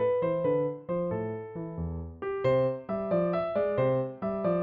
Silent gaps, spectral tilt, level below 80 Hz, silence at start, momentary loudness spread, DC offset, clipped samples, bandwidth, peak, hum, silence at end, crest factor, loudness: none; -7.5 dB/octave; -56 dBFS; 0 s; 9 LU; under 0.1%; under 0.1%; 5 kHz; -14 dBFS; none; 0 s; 14 dB; -30 LUFS